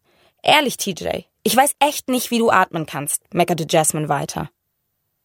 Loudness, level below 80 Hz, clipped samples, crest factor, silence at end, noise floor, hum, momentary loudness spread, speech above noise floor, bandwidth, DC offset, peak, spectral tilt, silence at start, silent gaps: -19 LUFS; -56 dBFS; under 0.1%; 20 dB; 0.8 s; -73 dBFS; none; 10 LU; 54 dB; 17 kHz; under 0.1%; 0 dBFS; -3 dB/octave; 0.45 s; none